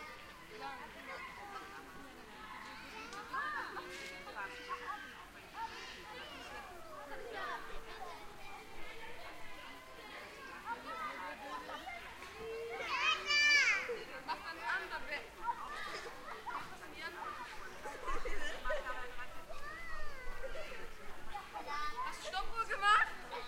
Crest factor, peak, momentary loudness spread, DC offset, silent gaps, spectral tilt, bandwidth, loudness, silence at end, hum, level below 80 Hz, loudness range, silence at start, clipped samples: 24 dB; -16 dBFS; 17 LU; under 0.1%; none; -1.5 dB/octave; 16 kHz; -40 LUFS; 0 s; none; -52 dBFS; 14 LU; 0 s; under 0.1%